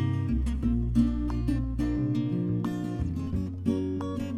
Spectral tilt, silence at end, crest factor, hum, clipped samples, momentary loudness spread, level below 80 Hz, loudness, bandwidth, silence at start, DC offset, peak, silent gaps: -9 dB/octave; 0 s; 16 dB; none; under 0.1%; 6 LU; -34 dBFS; -29 LUFS; 12 kHz; 0 s; under 0.1%; -12 dBFS; none